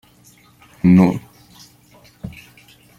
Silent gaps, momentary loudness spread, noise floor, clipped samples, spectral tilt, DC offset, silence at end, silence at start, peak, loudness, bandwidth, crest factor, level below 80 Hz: none; 23 LU; -50 dBFS; under 0.1%; -8.5 dB/octave; under 0.1%; 0.7 s; 0.85 s; -2 dBFS; -15 LUFS; 7.2 kHz; 18 dB; -50 dBFS